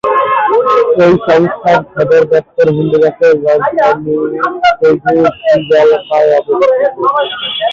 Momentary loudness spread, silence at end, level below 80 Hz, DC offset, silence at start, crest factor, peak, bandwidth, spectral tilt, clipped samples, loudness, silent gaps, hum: 4 LU; 0 s; -50 dBFS; under 0.1%; 0.05 s; 8 dB; 0 dBFS; 7.2 kHz; -6.5 dB/octave; under 0.1%; -10 LUFS; none; none